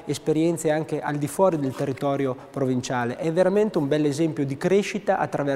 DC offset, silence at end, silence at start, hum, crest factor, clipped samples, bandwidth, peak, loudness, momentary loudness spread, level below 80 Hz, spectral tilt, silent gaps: under 0.1%; 0 s; 0 s; none; 16 dB; under 0.1%; 16 kHz; -8 dBFS; -24 LUFS; 5 LU; -60 dBFS; -6 dB/octave; none